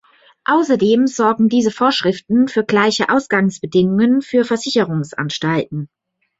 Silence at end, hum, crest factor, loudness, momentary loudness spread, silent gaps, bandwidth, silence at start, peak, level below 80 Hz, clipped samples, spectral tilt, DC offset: 0.55 s; none; 14 dB; -16 LUFS; 7 LU; none; 8 kHz; 0.5 s; -2 dBFS; -58 dBFS; under 0.1%; -5.5 dB/octave; under 0.1%